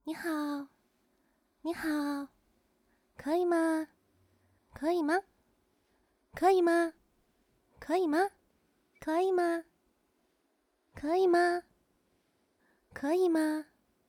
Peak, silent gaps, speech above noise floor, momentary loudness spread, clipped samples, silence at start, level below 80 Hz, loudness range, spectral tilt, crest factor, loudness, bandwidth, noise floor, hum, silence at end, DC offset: -14 dBFS; none; 47 dB; 16 LU; under 0.1%; 0.05 s; -70 dBFS; 3 LU; -4.5 dB/octave; 20 dB; -31 LUFS; 16 kHz; -76 dBFS; none; 0.45 s; under 0.1%